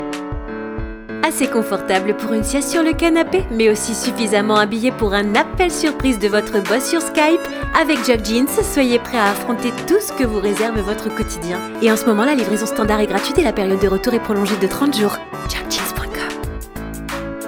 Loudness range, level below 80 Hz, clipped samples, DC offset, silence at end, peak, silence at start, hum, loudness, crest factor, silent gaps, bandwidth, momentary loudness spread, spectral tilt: 2 LU; -34 dBFS; under 0.1%; under 0.1%; 0 s; 0 dBFS; 0 s; none; -18 LUFS; 18 dB; none; over 20 kHz; 11 LU; -4 dB/octave